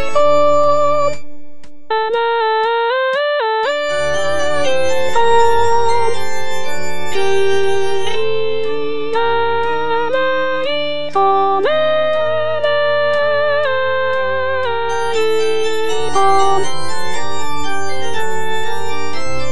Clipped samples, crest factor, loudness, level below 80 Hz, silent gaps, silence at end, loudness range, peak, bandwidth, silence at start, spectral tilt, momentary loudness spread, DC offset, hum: under 0.1%; 12 dB; -17 LUFS; -46 dBFS; none; 0 s; 3 LU; 0 dBFS; 11 kHz; 0 s; -3.5 dB/octave; 10 LU; 10%; none